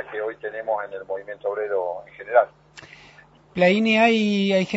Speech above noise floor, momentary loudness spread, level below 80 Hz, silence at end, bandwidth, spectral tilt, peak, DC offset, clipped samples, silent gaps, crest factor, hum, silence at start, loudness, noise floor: 29 dB; 15 LU; -64 dBFS; 0 s; 8 kHz; -6 dB/octave; -4 dBFS; under 0.1%; under 0.1%; none; 20 dB; none; 0 s; -22 LUFS; -51 dBFS